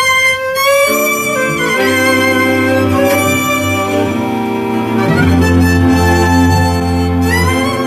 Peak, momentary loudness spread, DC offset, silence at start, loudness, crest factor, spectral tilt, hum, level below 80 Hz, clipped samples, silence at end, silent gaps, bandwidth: 0 dBFS; 4 LU; under 0.1%; 0 s; -11 LUFS; 12 dB; -5 dB/octave; none; -30 dBFS; under 0.1%; 0 s; none; 15 kHz